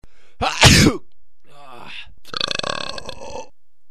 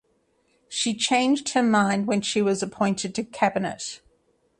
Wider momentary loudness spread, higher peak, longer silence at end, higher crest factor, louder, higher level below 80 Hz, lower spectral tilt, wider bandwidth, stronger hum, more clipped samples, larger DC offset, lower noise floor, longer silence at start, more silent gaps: first, 25 LU vs 11 LU; first, 0 dBFS vs -6 dBFS; second, 0.45 s vs 0.65 s; about the same, 20 dB vs 18 dB; first, -16 LUFS vs -24 LUFS; first, -34 dBFS vs -64 dBFS; about the same, -3.5 dB/octave vs -4 dB/octave; first, 14.5 kHz vs 11 kHz; neither; neither; first, 3% vs under 0.1%; second, -52 dBFS vs -67 dBFS; second, 0.4 s vs 0.7 s; neither